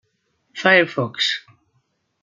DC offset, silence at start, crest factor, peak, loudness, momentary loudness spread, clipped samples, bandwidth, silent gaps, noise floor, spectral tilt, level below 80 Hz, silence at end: under 0.1%; 0.55 s; 20 dB; -2 dBFS; -18 LUFS; 13 LU; under 0.1%; 8.8 kHz; none; -68 dBFS; -4 dB/octave; -70 dBFS; 0.85 s